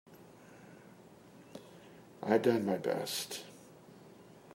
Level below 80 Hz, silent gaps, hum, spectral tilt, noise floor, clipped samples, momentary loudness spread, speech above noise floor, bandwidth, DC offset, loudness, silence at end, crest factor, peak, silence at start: -82 dBFS; none; none; -4.5 dB/octave; -57 dBFS; under 0.1%; 27 LU; 25 dB; 16 kHz; under 0.1%; -34 LUFS; 0 s; 24 dB; -14 dBFS; 0.1 s